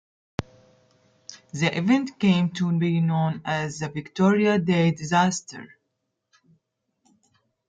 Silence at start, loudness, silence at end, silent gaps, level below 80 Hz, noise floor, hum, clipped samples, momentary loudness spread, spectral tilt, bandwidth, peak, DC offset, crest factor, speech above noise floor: 0.4 s; -23 LUFS; 2.05 s; none; -62 dBFS; -78 dBFS; none; under 0.1%; 15 LU; -6 dB/octave; 9.2 kHz; -8 dBFS; under 0.1%; 18 dB; 56 dB